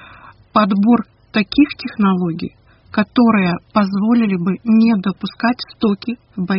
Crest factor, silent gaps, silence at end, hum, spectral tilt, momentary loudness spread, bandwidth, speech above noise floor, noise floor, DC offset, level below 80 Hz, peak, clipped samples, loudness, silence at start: 16 dB; none; 0 s; none; -5.5 dB/octave; 10 LU; 5.8 kHz; 27 dB; -42 dBFS; under 0.1%; -50 dBFS; -2 dBFS; under 0.1%; -16 LUFS; 0 s